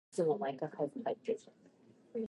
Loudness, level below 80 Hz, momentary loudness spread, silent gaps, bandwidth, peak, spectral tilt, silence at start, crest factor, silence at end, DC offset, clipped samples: -38 LUFS; under -90 dBFS; 8 LU; none; 11.5 kHz; -22 dBFS; -6.5 dB/octave; 0.15 s; 16 dB; 0 s; under 0.1%; under 0.1%